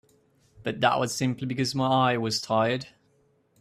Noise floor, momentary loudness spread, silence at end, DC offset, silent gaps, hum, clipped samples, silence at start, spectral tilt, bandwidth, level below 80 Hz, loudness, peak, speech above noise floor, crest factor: -66 dBFS; 11 LU; 0.75 s; under 0.1%; none; none; under 0.1%; 0.6 s; -5 dB/octave; 14.5 kHz; -64 dBFS; -26 LUFS; -8 dBFS; 41 dB; 20 dB